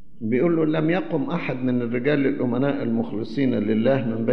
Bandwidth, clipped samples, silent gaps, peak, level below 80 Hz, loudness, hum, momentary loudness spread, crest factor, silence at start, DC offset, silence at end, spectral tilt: 6 kHz; under 0.1%; none; -8 dBFS; -58 dBFS; -23 LUFS; none; 5 LU; 14 dB; 0.2 s; 2%; 0 s; -9.5 dB/octave